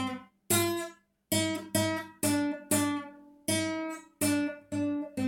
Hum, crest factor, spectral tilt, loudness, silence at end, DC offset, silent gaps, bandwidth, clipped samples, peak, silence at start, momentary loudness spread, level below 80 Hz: none; 18 dB; -3.5 dB/octave; -31 LUFS; 0 s; under 0.1%; none; 17 kHz; under 0.1%; -14 dBFS; 0 s; 10 LU; -70 dBFS